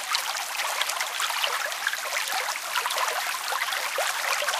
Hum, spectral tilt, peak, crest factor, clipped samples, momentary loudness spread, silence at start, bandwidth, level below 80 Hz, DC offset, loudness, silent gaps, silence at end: none; 3.5 dB/octave; -6 dBFS; 22 dB; under 0.1%; 2 LU; 0 s; 16 kHz; -86 dBFS; under 0.1%; -26 LUFS; none; 0 s